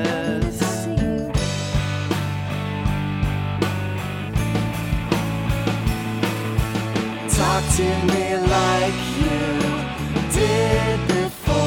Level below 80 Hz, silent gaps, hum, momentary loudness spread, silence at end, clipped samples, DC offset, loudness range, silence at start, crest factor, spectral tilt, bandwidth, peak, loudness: -32 dBFS; none; none; 6 LU; 0 s; under 0.1%; under 0.1%; 4 LU; 0 s; 18 dB; -5 dB/octave; 17 kHz; -4 dBFS; -22 LUFS